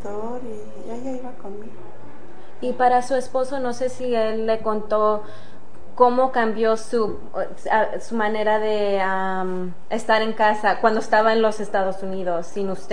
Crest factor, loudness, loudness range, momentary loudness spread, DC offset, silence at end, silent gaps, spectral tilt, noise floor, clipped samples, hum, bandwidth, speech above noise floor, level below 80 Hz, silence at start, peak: 20 dB; -22 LUFS; 5 LU; 15 LU; 6%; 0 s; none; -5 dB/octave; -45 dBFS; under 0.1%; none; 10 kHz; 23 dB; -58 dBFS; 0 s; -2 dBFS